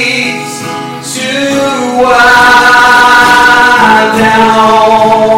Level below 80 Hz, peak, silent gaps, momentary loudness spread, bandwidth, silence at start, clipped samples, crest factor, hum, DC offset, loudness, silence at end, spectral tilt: -36 dBFS; 0 dBFS; none; 13 LU; over 20 kHz; 0 s; 10%; 6 dB; none; under 0.1%; -5 LUFS; 0 s; -3 dB/octave